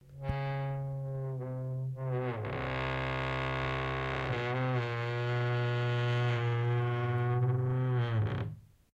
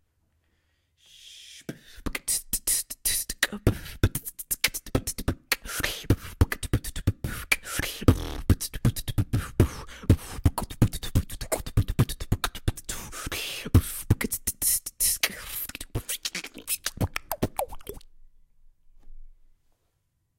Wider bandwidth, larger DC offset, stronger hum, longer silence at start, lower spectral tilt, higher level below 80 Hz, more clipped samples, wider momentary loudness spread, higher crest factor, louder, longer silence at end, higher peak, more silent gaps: second, 7.4 kHz vs 17 kHz; neither; neither; second, 0.05 s vs 1.25 s; first, -8 dB/octave vs -4 dB/octave; second, -52 dBFS vs -36 dBFS; neither; second, 7 LU vs 11 LU; second, 12 dB vs 26 dB; second, -33 LUFS vs -28 LUFS; second, 0.3 s vs 1.05 s; second, -20 dBFS vs -2 dBFS; neither